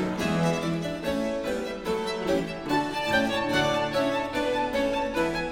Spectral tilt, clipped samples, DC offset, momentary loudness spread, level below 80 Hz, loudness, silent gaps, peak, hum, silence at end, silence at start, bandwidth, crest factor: -5 dB/octave; under 0.1%; under 0.1%; 5 LU; -48 dBFS; -27 LUFS; none; -10 dBFS; none; 0 s; 0 s; 17.5 kHz; 16 dB